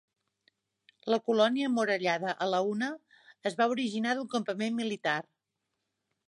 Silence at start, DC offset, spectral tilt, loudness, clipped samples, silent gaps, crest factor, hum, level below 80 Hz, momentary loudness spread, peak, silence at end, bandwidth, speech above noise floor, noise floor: 1.05 s; under 0.1%; -4.5 dB/octave; -30 LUFS; under 0.1%; none; 18 dB; none; -84 dBFS; 9 LU; -14 dBFS; 1.05 s; 11.5 kHz; 55 dB; -84 dBFS